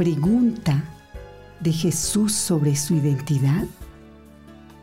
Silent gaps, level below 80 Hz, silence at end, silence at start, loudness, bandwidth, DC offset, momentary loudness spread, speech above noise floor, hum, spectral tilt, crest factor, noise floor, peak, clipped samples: none; -46 dBFS; 0.05 s; 0 s; -21 LUFS; 16 kHz; under 0.1%; 16 LU; 25 dB; none; -5.5 dB/octave; 12 dB; -46 dBFS; -12 dBFS; under 0.1%